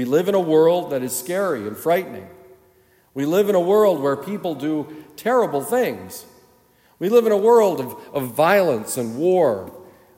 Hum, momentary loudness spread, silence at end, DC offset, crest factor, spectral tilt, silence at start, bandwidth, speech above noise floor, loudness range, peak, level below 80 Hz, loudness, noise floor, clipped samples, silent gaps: none; 13 LU; 0.35 s; under 0.1%; 16 dB; -5.5 dB/octave; 0 s; 16.5 kHz; 38 dB; 4 LU; -4 dBFS; -70 dBFS; -19 LUFS; -57 dBFS; under 0.1%; none